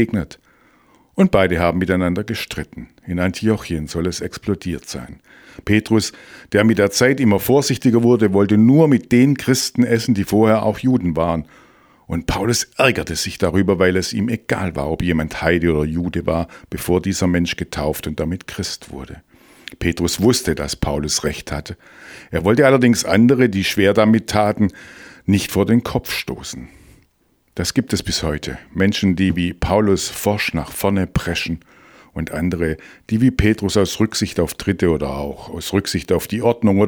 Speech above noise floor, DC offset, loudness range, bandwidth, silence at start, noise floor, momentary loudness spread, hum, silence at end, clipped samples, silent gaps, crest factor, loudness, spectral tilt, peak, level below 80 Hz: 44 dB; under 0.1%; 7 LU; over 20 kHz; 0 s; -61 dBFS; 14 LU; none; 0 s; under 0.1%; none; 18 dB; -18 LUFS; -5.5 dB/octave; 0 dBFS; -38 dBFS